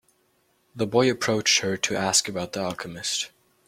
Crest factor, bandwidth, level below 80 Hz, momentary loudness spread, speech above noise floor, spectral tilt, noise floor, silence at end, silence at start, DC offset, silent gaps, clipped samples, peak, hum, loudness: 22 dB; 16.5 kHz; -64 dBFS; 10 LU; 42 dB; -2.5 dB/octave; -67 dBFS; 0.4 s; 0.75 s; under 0.1%; none; under 0.1%; -4 dBFS; none; -24 LUFS